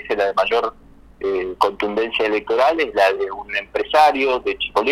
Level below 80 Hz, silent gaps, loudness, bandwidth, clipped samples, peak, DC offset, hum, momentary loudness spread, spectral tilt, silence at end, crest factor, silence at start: -50 dBFS; none; -19 LUFS; 15.5 kHz; under 0.1%; 0 dBFS; under 0.1%; none; 9 LU; -3.5 dB/octave; 0 s; 20 dB; 0 s